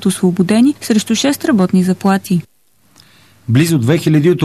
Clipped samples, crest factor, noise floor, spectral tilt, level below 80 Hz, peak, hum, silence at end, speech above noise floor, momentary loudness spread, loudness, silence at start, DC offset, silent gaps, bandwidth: under 0.1%; 12 dB; -52 dBFS; -6 dB/octave; -52 dBFS; -2 dBFS; none; 0 s; 40 dB; 4 LU; -13 LUFS; 0 s; 0.2%; none; 14 kHz